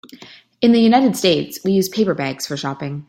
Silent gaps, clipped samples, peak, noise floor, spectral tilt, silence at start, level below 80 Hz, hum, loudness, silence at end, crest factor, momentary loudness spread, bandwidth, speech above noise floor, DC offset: none; under 0.1%; -2 dBFS; -42 dBFS; -5 dB/octave; 0.2 s; -58 dBFS; none; -17 LUFS; 0.05 s; 16 dB; 11 LU; 16.5 kHz; 26 dB; under 0.1%